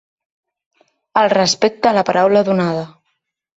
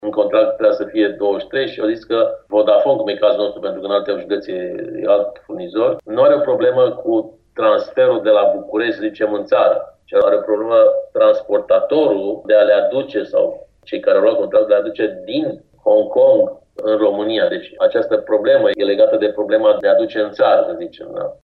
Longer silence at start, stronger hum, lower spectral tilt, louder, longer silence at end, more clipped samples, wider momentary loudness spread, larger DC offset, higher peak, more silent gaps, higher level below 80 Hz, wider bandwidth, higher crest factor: first, 1.15 s vs 0.05 s; neither; second, -4.5 dB/octave vs -7.5 dB/octave; about the same, -15 LUFS vs -16 LUFS; first, 0.75 s vs 0.1 s; neither; about the same, 7 LU vs 9 LU; neither; about the same, -2 dBFS vs -2 dBFS; neither; about the same, -60 dBFS vs -60 dBFS; first, 8 kHz vs 5.8 kHz; about the same, 16 dB vs 14 dB